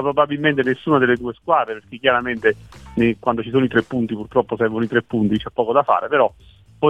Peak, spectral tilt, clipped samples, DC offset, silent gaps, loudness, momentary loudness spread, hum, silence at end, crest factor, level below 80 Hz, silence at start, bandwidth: -2 dBFS; -7.5 dB/octave; under 0.1%; 0.1%; none; -19 LUFS; 5 LU; none; 0 s; 18 dB; -50 dBFS; 0 s; 9 kHz